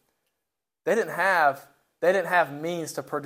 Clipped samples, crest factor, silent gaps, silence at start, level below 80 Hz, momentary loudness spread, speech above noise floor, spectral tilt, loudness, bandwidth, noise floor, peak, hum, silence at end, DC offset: under 0.1%; 18 dB; none; 0.85 s; -80 dBFS; 11 LU; 60 dB; -4 dB/octave; -25 LUFS; 16 kHz; -85 dBFS; -8 dBFS; none; 0 s; under 0.1%